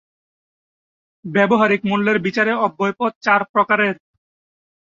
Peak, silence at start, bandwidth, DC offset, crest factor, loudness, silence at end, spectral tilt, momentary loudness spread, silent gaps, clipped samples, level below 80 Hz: -2 dBFS; 1.25 s; 7.4 kHz; under 0.1%; 18 dB; -17 LUFS; 1 s; -6.5 dB/octave; 6 LU; 3.15-3.21 s, 3.49-3.54 s; under 0.1%; -64 dBFS